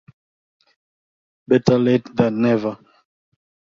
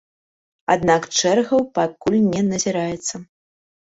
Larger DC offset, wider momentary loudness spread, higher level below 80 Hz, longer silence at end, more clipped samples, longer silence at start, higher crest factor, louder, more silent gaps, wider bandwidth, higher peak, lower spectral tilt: neither; about the same, 9 LU vs 10 LU; about the same, -56 dBFS vs -56 dBFS; first, 1 s vs 0.75 s; neither; first, 1.5 s vs 0.7 s; about the same, 20 dB vs 18 dB; about the same, -18 LUFS vs -19 LUFS; neither; about the same, 7.4 kHz vs 8 kHz; about the same, -2 dBFS vs -2 dBFS; first, -7.5 dB/octave vs -4 dB/octave